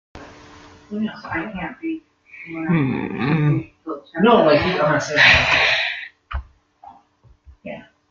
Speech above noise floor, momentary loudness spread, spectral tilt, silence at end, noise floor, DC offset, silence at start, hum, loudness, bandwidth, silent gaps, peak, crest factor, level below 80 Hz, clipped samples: 36 dB; 20 LU; -5.5 dB/octave; 0.3 s; -54 dBFS; under 0.1%; 0.15 s; none; -17 LUFS; 7.4 kHz; none; 0 dBFS; 20 dB; -42 dBFS; under 0.1%